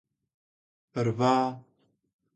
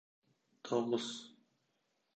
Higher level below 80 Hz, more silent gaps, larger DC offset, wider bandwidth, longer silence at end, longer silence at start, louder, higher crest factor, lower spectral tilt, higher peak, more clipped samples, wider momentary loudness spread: first, -70 dBFS vs -90 dBFS; neither; neither; about the same, 9 kHz vs 8.8 kHz; about the same, 0.75 s vs 0.85 s; first, 0.95 s vs 0.65 s; first, -27 LUFS vs -38 LUFS; about the same, 20 dB vs 22 dB; first, -7 dB/octave vs -4.5 dB/octave; first, -12 dBFS vs -20 dBFS; neither; second, 15 LU vs 19 LU